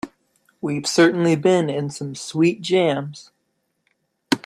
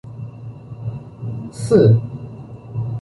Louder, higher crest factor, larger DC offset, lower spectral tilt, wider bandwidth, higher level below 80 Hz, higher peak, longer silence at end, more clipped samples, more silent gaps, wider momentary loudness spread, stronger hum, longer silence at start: about the same, -20 LUFS vs -18 LUFS; about the same, 18 dB vs 18 dB; neither; second, -5 dB/octave vs -8.5 dB/octave; first, 13.5 kHz vs 11.5 kHz; second, -66 dBFS vs -48 dBFS; about the same, -4 dBFS vs -2 dBFS; about the same, 0.1 s vs 0 s; neither; neither; second, 14 LU vs 22 LU; neither; about the same, 0.05 s vs 0.05 s